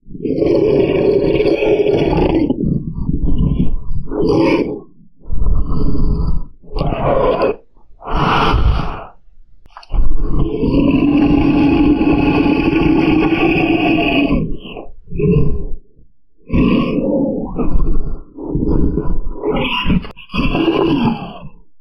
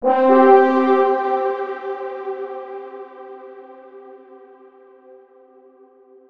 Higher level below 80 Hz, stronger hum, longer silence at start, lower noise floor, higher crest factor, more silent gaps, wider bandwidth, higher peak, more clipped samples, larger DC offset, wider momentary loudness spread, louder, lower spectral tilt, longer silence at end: first, -20 dBFS vs -70 dBFS; neither; about the same, 0.05 s vs 0 s; about the same, -49 dBFS vs -50 dBFS; about the same, 14 dB vs 18 dB; neither; first, 6 kHz vs 5.2 kHz; about the same, 0 dBFS vs -2 dBFS; neither; neither; second, 13 LU vs 26 LU; about the same, -16 LUFS vs -17 LUFS; first, -8.5 dB/octave vs -6 dB/octave; second, 0.25 s vs 1.95 s